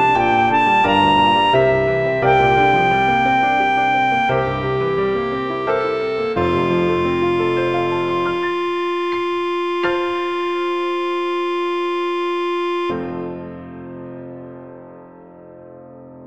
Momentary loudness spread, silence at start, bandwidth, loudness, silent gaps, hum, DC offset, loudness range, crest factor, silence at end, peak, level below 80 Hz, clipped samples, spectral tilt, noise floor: 14 LU; 0 s; 8.4 kHz; -17 LUFS; none; none; 0.4%; 10 LU; 16 dB; 0 s; -2 dBFS; -46 dBFS; under 0.1%; -6.5 dB/octave; -40 dBFS